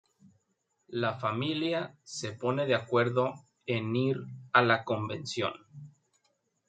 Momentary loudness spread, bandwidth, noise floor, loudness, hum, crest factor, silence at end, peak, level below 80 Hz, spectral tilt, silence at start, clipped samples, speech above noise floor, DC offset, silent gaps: 12 LU; 9.4 kHz; -78 dBFS; -30 LUFS; none; 24 dB; 0.8 s; -8 dBFS; -74 dBFS; -5.5 dB/octave; 0.9 s; under 0.1%; 47 dB; under 0.1%; none